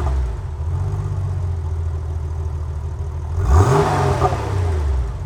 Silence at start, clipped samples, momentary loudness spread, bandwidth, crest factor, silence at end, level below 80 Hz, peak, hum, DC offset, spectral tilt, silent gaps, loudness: 0 s; under 0.1%; 11 LU; 11 kHz; 18 dB; 0 s; -24 dBFS; -2 dBFS; none; under 0.1%; -7 dB/octave; none; -21 LUFS